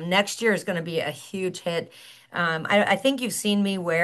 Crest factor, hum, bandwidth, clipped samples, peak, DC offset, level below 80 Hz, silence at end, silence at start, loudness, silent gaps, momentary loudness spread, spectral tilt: 18 dB; none; 12.5 kHz; under 0.1%; -6 dBFS; under 0.1%; -74 dBFS; 0 s; 0 s; -25 LUFS; none; 10 LU; -4 dB/octave